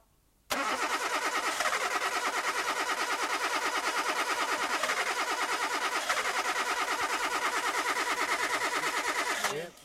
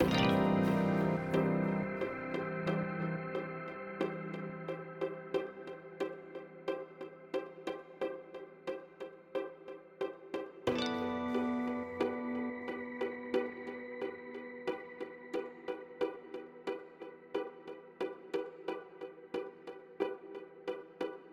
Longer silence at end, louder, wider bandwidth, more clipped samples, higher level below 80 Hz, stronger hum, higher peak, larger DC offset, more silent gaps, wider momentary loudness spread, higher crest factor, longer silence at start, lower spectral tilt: about the same, 0 s vs 0 s; first, -30 LUFS vs -38 LUFS; about the same, 16.5 kHz vs 16.5 kHz; neither; about the same, -68 dBFS vs -66 dBFS; neither; about the same, -16 dBFS vs -14 dBFS; neither; neither; second, 1 LU vs 15 LU; second, 16 dB vs 22 dB; first, 0.5 s vs 0 s; second, 0 dB/octave vs -7 dB/octave